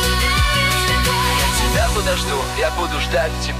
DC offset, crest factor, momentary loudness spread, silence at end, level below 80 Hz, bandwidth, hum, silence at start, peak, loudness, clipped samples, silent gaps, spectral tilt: under 0.1%; 12 dB; 4 LU; 0 s; -24 dBFS; 15.5 kHz; none; 0 s; -6 dBFS; -17 LUFS; under 0.1%; none; -3.5 dB/octave